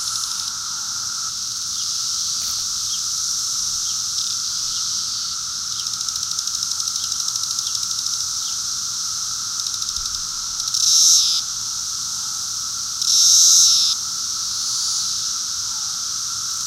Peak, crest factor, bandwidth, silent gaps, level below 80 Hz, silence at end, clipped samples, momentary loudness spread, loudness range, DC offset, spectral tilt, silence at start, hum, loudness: -2 dBFS; 20 dB; 17 kHz; none; -54 dBFS; 0 s; under 0.1%; 11 LU; 6 LU; under 0.1%; 3 dB/octave; 0 s; none; -18 LUFS